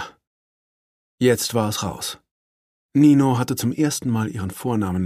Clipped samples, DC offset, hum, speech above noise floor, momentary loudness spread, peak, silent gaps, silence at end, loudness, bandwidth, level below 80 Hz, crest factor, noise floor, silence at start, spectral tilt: under 0.1%; under 0.1%; none; over 70 dB; 14 LU; -4 dBFS; 0.27-1.18 s, 2.31-2.89 s; 0 s; -21 LUFS; 15.5 kHz; -54 dBFS; 16 dB; under -90 dBFS; 0 s; -5.5 dB/octave